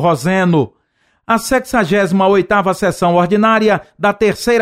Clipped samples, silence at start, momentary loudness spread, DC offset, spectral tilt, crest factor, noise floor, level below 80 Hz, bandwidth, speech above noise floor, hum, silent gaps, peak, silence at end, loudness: under 0.1%; 0 s; 5 LU; 0.2%; -6 dB/octave; 12 dB; -61 dBFS; -44 dBFS; 16 kHz; 48 dB; none; none; -2 dBFS; 0 s; -14 LUFS